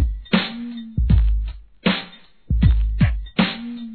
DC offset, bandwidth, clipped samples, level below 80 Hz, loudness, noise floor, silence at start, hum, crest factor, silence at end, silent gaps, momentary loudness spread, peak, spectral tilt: 0.3%; 4.6 kHz; under 0.1%; -22 dBFS; -21 LUFS; -42 dBFS; 0 s; none; 18 dB; 0 s; none; 11 LU; -2 dBFS; -9.5 dB/octave